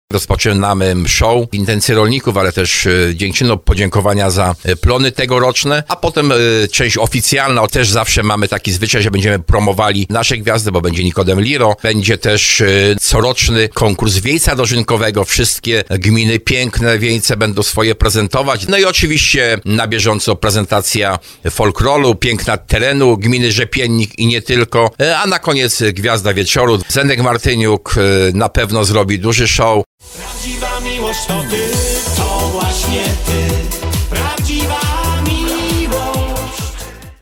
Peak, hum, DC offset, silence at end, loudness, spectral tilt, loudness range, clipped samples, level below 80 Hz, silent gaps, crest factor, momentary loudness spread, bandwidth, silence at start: 0 dBFS; none; under 0.1%; 0.1 s; -12 LUFS; -4 dB/octave; 5 LU; under 0.1%; -24 dBFS; 29.86-29.98 s; 12 dB; 6 LU; 18 kHz; 0.1 s